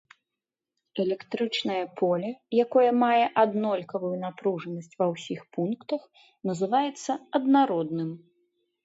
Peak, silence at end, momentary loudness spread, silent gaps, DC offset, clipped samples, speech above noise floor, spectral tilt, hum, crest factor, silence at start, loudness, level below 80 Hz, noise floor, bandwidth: -8 dBFS; 0.7 s; 12 LU; none; under 0.1%; under 0.1%; 62 dB; -6 dB/octave; none; 18 dB; 0.95 s; -27 LUFS; -80 dBFS; -88 dBFS; 8 kHz